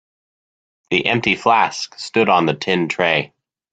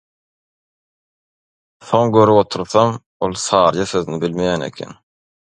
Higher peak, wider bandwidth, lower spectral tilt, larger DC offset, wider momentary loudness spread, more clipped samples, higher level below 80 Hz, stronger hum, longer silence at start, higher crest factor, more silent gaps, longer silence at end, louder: about the same, 0 dBFS vs 0 dBFS; second, 9.2 kHz vs 11 kHz; about the same, -4.5 dB/octave vs -5.5 dB/octave; neither; second, 6 LU vs 11 LU; neither; second, -58 dBFS vs -50 dBFS; neither; second, 0.9 s vs 1.85 s; about the same, 18 dB vs 18 dB; second, none vs 3.06-3.20 s; second, 0.45 s vs 0.65 s; about the same, -17 LUFS vs -16 LUFS